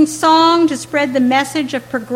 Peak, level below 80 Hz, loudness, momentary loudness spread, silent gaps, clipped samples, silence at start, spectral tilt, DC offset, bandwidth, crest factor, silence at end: -2 dBFS; -56 dBFS; -14 LUFS; 10 LU; none; under 0.1%; 0 s; -3.5 dB/octave; under 0.1%; 16 kHz; 12 dB; 0 s